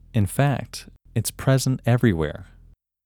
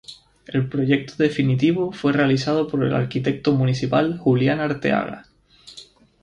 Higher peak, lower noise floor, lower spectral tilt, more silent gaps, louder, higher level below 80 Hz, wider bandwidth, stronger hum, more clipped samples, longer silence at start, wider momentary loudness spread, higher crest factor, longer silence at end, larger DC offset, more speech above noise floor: about the same, -6 dBFS vs -6 dBFS; first, -53 dBFS vs -48 dBFS; second, -6 dB/octave vs -7.5 dB/octave; neither; about the same, -23 LUFS vs -21 LUFS; first, -44 dBFS vs -54 dBFS; first, 19 kHz vs 10 kHz; neither; neither; about the same, 0.15 s vs 0.1 s; first, 15 LU vs 12 LU; about the same, 18 dB vs 16 dB; first, 0.6 s vs 0.4 s; neither; about the same, 31 dB vs 28 dB